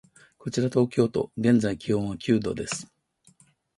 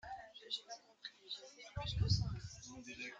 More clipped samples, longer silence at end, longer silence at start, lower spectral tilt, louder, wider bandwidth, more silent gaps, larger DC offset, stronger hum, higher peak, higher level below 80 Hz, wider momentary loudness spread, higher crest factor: neither; first, 0.9 s vs 0 s; first, 0.45 s vs 0.05 s; first, -6 dB/octave vs -4.5 dB/octave; first, -26 LUFS vs -43 LUFS; first, 11.5 kHz vs 7.8 kHz; neither; neither; neither; first, -8 dBFS vs -22 dBFS; about the same, -56 dBFS vs -54 dBFS; second, 10 LU vs 16 LU; about the same, 18 dB vs 22 dB